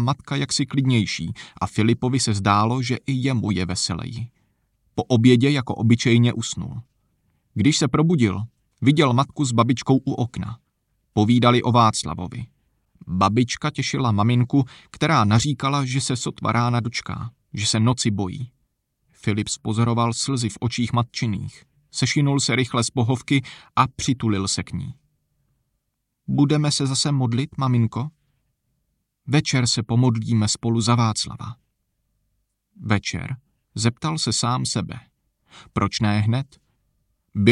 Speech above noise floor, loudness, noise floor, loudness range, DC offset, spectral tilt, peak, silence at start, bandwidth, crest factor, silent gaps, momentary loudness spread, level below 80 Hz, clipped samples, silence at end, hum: 55 dB; -21 LUFS; -76 dBFS; 4 LU; under 0.1%; -5 dB/octave; -2 dBFS; 0 s; 11 kHz; 20 dB; none; 15 LU; -52 dBFS; under 0.1%; 0 s; none